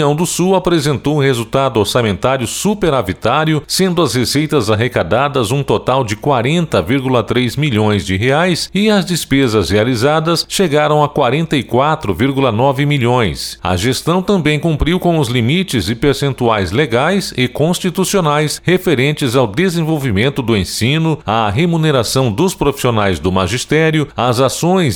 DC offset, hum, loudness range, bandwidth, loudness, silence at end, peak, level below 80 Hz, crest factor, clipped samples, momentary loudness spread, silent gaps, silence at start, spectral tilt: under 0.1%; none; 1 LU; 19 kHz; -14 LUFS; 0 s; -2 dBFS; -36 dBFS; 12 dB; under 0.1%; 3 LU; none; 0 s; -5 dB/octave